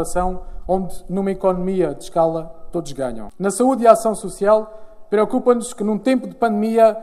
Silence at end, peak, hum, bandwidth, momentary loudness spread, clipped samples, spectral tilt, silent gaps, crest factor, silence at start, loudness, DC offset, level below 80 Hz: 0 s; 0 dBFS; none; 14 kHz; 12 LU; under 0.1%; -6 dB/octave; none; 18 dB; 0 s; -19 LUFS; under 0.1%; -38 dBFS